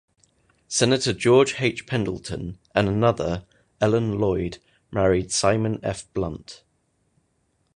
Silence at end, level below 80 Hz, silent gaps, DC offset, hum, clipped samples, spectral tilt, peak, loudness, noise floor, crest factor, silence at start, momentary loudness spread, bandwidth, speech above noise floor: 1.2 s; -46 dBFS; none; under 0.1%; none; under 0.1%; -5 dB/octave; -2 dBFS; -23 LUFS; -69 dBFS; 22 dB; 0.7 s; 14 LU; 11 kHz; 47 dB